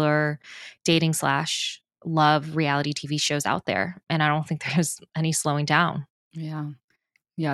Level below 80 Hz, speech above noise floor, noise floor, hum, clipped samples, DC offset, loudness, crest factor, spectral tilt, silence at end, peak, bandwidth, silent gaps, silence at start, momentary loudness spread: -64 dBFS; 47 dB; -71 dBFS; none; under 0.1%; under 0.1%; -24 LUFS; 22 dB; -4.5 dB/octave; 0 s; -4 dBFS; 12.5 kHz; 6.10-6.31 s, 6.84-6.88 s; 0 s; 15 LU